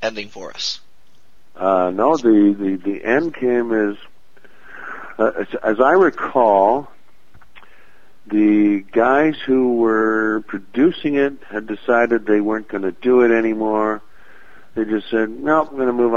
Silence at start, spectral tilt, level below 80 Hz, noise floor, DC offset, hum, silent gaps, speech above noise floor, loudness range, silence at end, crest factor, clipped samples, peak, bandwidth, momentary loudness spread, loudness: 0 s; -6 dB/octave; -56 dBFS; -58 dBFS; 2%; none; none; 41 dB; 2 LU; 0 s; 16 dB; under 0.1%; 0 dBFS; 7.4 kHz; 12 LU; -17 LUFS